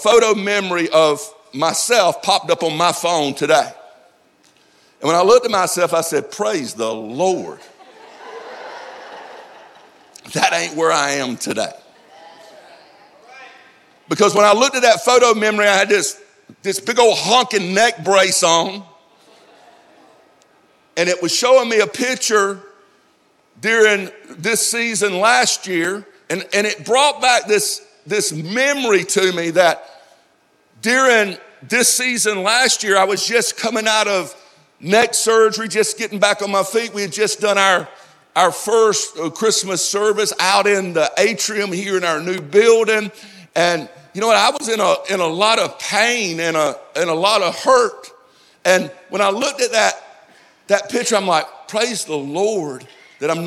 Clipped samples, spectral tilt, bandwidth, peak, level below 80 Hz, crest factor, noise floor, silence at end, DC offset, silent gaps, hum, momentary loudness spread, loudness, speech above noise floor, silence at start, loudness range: under 0.1%; -2 dB/octave; 15.5 kHz; 0 dBFS; -68 dBFS; 16 dB; -57 dBFS; 0 s; under 0.1%; none; none; 12 LU; -16 LUFS; 41 dB; 0 s; 6 LU